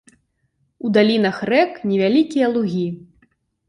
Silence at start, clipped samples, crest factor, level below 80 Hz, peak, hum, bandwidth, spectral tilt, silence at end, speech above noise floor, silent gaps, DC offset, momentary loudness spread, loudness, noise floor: 0.85 s; under 0.1%; 16 dB; -62 dBFS; -2 dBFS; none; 10.5 kHz; -7 dB/octave; 0.7 s; 50 dB; none; under 0.1%; 10 LU; -18 LUFS; -67 dBFS